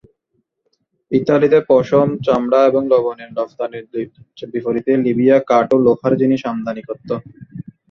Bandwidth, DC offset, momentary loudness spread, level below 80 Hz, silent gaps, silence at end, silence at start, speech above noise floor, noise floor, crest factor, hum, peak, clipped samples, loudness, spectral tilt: 6.8 kHz; under 0.1%; 14 LU; -58 dBFS; none; 0.3 s; 1.1 s; 53 dB; -69 dBFS; 14 dB; none; -2 dBFS; under 0.1%; -16 LUFS; -8 dB/octave